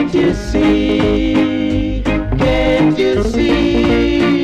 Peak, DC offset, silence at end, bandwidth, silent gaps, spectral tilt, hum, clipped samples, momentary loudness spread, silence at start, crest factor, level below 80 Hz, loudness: -6 dBFS; under 0.1%; 0 s; 9.6 kHz; none; -6.5 dB/octave; none; under 0.1%; 4 LU; 0 s; 8 dB; -24 dBFS; -14 LUFS